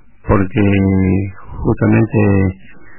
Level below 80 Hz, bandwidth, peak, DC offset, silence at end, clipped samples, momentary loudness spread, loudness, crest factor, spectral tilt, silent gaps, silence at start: -32 dBFS; 3.1 kHz; -2 dBFS; under 0.1%; 0 s; under 0.1%; 8 LU; -14 LUFS; 12 dB; -12.5 dB/octave; none; 0.25 s